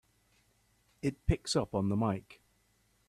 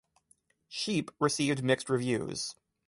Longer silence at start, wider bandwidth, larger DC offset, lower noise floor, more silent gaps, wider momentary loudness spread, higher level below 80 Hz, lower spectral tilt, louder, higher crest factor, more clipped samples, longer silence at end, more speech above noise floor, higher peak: first, 1.05 s vs 0.7 s; first, 13.5 kHz vs 11.5 kHz; neither; about the same, -72 dBFS vs -70 dBFS; neither; about the same, 7 LU vs 9 LU; first, -48 dBFS vs -68 dBFS; first, -6 dB/octave vs -4.5 dB/octave; second, -34 LUFS vs -31 LUFS; about the same, 22 dB vs 20 dB; neither; first, 0.75 s vs 0.35 s; about the same, 40 dB vs 39 dB; about the same, -14 dBFS vs -12 dBFS